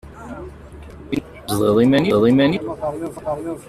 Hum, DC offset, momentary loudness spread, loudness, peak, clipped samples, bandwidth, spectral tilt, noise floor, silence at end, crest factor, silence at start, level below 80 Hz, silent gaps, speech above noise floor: none; under 0.1%; 22 LU; -18 LUFS; -4 dBFS; under 0.1%; 15 kHz; -6.5 dB/octave; -38 dBFS; 0.05 s; 16 dB; 0.05 s; -44 dBFS; none; 21 dB